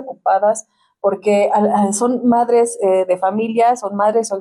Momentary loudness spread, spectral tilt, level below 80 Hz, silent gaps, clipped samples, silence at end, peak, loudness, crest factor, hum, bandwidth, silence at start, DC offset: 4 LU; -5 dB/octave; -68 dBFS; none; under 0.1%; 0 s; -4 dBFS; -16 LUFS; 10 dB; none; 13 kHz; 0 s; under 0.1%